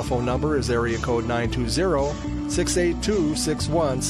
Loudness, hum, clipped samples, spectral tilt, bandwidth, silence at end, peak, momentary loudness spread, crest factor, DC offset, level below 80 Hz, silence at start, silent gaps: -23 LUFS; none; under 0.1%; -5 dB/octave; 15 kHz; 0 s; -10 dBFS; 3 LU; 14 dB; under 0.1%; -34 dBFS; 0 s; none